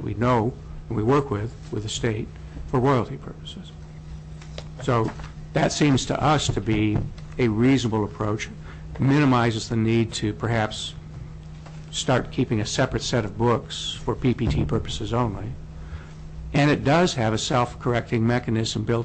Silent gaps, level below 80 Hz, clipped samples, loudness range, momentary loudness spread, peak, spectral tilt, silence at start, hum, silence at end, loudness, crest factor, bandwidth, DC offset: none; -40 dBFS; under 0.1%; 4 LU; 19 LU; -12 dBFS; -5.5 dB/octave; 0 s; none; 0 s; -24 LUFS; 12 dB; 8.6 kHz; under 0.1%